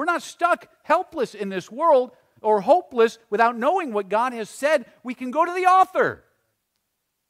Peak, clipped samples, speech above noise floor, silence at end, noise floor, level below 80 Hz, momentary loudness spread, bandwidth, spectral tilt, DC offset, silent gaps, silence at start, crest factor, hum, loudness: -4 dBFS; under 0.1%; 55 dB; 1.15 s; -77 dBFS; -72 dBFS; 11 LU; 15.5 kHz; -4.5 dB/octave; under 0.1%; none; 0 s; 18 dB; none; -22 LUFS